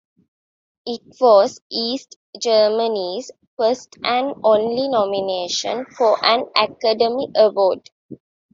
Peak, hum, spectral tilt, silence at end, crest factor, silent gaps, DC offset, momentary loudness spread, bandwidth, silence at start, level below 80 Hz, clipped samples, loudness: -2 dBFS; none; -3 dB/octave; 0.4 s; 18 dB; 1.62-1.70 s, 2.16-2.33 s, 3.47-3.57 s, 7.92-8.09 s; under 0.1%; 14 LU; 7.6 kHz; 0.85 s; -68 dBFS; under 0.1%; -18 LUFS